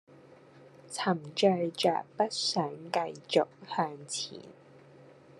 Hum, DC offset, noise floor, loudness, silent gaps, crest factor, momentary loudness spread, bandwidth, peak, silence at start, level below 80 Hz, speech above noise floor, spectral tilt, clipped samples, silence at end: none; under 0.1%; -56 dBFS; -31 LUFS; none; 20 dB; 9 LU; 12.5 kHz; -12 dBFS; 0.55 s; -82 dBFS; 25 dB; -4 dB/octave; under 0.1%; 0.35 s